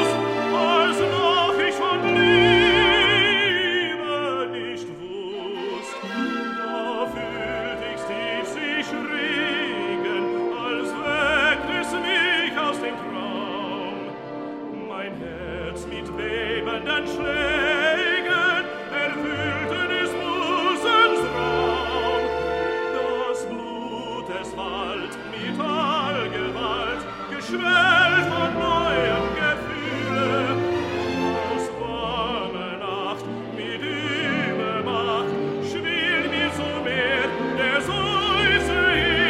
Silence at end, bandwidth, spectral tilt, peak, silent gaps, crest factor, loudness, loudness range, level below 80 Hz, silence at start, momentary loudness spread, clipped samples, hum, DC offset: 0 s; 13 kHz; -4.5 dB/octave; -4 dBFS; none; 20 dB; -22 LUFS; 9 LU; -46 dBFS; 0 s; 13 LU; under 0.1%; none; under 0.1%